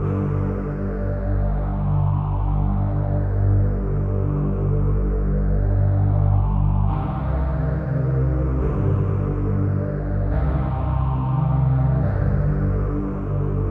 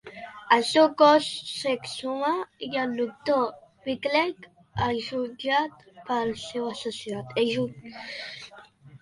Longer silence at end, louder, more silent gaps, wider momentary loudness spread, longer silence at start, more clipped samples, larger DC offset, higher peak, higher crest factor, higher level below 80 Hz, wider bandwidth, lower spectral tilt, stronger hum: about the same, 0 s vs 0.05 s; first, -22 LUFS vs -26 LUFS; neither; second, 5 LU vs 18 LU; about the same, 0 s vs 0.05 s; neither; neither; about the same, -8 dBFS vs -6 dBFS; second, 12 dB vs 22 dB; first, -24 dBFS vs -60 dBFS; second, 3.1 kHz vs 11.5 kHz; first, -12 dB/octave vs -4.5 dB/octave; first, 50 Hz at -35 dBFS vs none